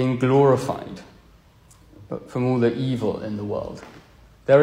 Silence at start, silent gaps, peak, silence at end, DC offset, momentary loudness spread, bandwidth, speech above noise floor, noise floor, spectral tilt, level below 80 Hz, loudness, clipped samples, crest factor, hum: 0 s; none; -4 dBFS; 0 s; under 0.1%; 18 LU; 14 kHz; 30 dB; -52 dBFS; -8 dB/octave; -54 dBFS; -22 LUFS; under 0.1%; 18 dB; none